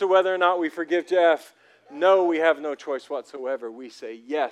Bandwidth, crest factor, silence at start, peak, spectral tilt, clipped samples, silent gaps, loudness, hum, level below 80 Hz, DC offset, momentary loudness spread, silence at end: 12 kHz; 18 dB; 0 s; -6 dBFS; -4 dB/octave; under 0.1%; none; -23 LUFS; none; under -90 dBFS; under 0.1%; 18 LU; 0 s